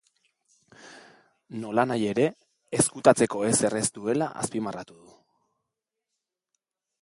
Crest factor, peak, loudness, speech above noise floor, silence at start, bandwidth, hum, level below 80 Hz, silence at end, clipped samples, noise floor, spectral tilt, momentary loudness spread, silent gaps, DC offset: 26 dB; -2 dBFS; -25 LUFS; 60 dB; 0.85 s; 12 kHz; none; -64 dBFS; 2.15 s; under 0.1%; -85 dBFS; -4.5 dB/octave; 16 LU; none; under 0.1%